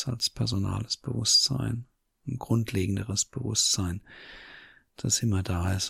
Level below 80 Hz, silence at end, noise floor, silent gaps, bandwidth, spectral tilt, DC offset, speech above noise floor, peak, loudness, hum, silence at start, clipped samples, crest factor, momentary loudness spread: -50 dBFS; 0 s; -52 dBFS; none; 16 kHz; -3.5 dB/octave; under 0.1%; 24 dB; -10 dBFS; -27 LUFS; none; 0 s; under 0.1%; 18 dB; 21 LU